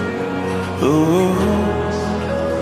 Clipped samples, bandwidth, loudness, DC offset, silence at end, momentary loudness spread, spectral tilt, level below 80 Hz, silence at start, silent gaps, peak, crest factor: under 0.1%; 15.5 kHz; -18 LUFS; under 0.1%; 0 s; 7 LU; -6.5 dB/octave; -36 dBFS; 0 s; none; -4 dBFS; 14 dB